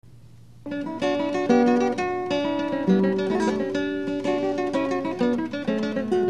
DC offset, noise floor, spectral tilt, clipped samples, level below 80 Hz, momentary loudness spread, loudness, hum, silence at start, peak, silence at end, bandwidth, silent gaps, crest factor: 0.3%; -49 dBFS; -6.5 dB/octave; under 0.1%; -60 dBFS; 6 LU; -24 LUFS; none; 0.15 s; -6 dBFS; 0 s; 11 kHz; none; 18 dB